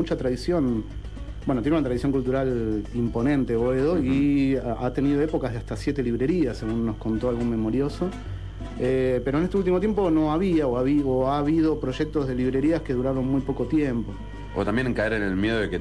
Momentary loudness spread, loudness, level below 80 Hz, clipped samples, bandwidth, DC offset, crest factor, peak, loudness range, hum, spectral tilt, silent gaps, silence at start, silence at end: 8 LU; -24 LUFS; -38 dBFS; under 0.1%; 11 kHz; 0.3%; 12 dB; -12 dBFS; 3 LU; 50 Hz at -35 dBFS; -8 dB/octave; none; 0 s; 0 s